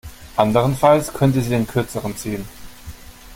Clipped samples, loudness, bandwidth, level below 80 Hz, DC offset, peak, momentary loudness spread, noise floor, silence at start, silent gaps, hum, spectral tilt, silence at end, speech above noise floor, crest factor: under 0.1%; -19 LUFS; 17 kHz; -42 dBFS; under 0.1%; 0 dBFS; 23 LU; -38 dBFS; 0.05 s; none; none; -6.5 dB/octave; 0 s; 20 dB; 18 dB